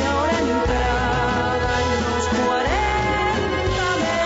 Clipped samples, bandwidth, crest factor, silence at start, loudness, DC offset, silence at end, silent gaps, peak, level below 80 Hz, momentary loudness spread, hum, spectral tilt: under 0.1%; 8 kHz; 12 dB; 0 s; -20 LUFS; under 0.1%; 0 s; none; -8 dBFS; -30 dBFS; 1 LU; none; -5 dB/octave